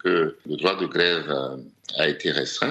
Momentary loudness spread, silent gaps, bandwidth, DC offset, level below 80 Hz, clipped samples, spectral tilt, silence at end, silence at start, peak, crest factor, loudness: 9 LU; none; 8.8 kHz; under 0.1%; -66 dBFS; under 0.1%; -4 dB/octave; 0 s; 0.05 s; -4 dBFS; 22 dB; -24 LUFS